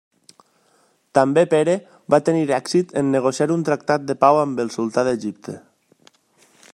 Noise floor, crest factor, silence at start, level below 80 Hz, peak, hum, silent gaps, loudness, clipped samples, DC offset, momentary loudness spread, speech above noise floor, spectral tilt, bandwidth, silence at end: -61 dBFS; 20 dB; 1.15 s; -66 dBFS; -2 dBFS; none; none; -19 LUFS; under 0.1%; under 0.1%; 9 LU; 42 dB; -6 dB/octave; 12 kHz; 1.15 s